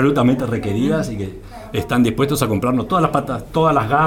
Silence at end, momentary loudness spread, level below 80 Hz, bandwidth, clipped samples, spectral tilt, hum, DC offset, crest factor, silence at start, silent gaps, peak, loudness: 0 s; 10 LU; -38 dBFS; 17.5 kHz; under 0.1%; -6.5 dB/octave; none; under 0.1%; 16 dB; 0 s; none; -2 dBFS; -18 LUFS